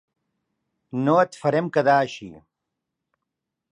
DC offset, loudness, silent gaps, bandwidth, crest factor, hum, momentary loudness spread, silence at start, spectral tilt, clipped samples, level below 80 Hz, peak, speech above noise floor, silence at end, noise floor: under 0.1%; -21 LUFS; none; 11 kHz; 20 dB; none; 12 LU; 0.95 s; -6.5 dB/octave; under 0.1%; -70 dBFS; -6 dBFS; 62 dB; 1.35 s; -83 dBFS